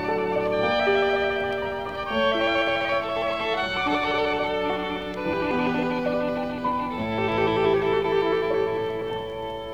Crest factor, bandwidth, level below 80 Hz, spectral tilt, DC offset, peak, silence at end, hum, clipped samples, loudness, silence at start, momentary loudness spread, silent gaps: 16 dB; 15 kHz; -50 dBFS; -6 dB/octave; 0.3%; -10 dBFS; 0 s; none; under 0.1%; -24 LUFS; 0 s; 7 LU; none